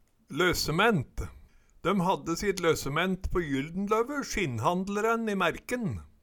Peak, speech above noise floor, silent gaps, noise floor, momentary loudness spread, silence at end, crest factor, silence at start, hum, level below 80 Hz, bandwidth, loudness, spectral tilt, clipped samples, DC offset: -10 dBFS; 25 dB; none; -54 dBFS; 8 LU; 0.15 s; 20 dB; 0.3 s; none; -44 dBFS; 19 kHz; -29 LUFS; -5 dB/octave; under 0.1%; under 0.1%